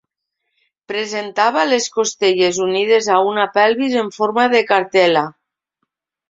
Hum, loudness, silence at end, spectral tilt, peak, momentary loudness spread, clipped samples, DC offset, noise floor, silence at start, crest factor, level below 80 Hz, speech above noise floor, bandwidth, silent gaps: none; -16 LUFS; 1 s; -3 dB/octave; -2 dBFS; 8 LU; under 0.1%; under 0.1%; -76 dBFS; 0.9 s; 16 dB; -66 dBFS; 60 dB; 7.8 kHz; none